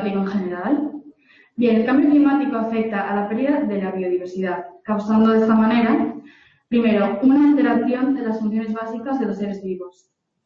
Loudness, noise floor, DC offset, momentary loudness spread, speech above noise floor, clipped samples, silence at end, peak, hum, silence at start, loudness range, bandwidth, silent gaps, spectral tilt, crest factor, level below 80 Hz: -19 LUFS; -50 dBFS; under 0.1%; 12 LU; 32 dB; under 0.1%; 0.55 s; -6 dBFS; none; 0 s; 3 LU; 6.6 kHz; none; -8.5 dB/octave; 14 dB; -60 dBFS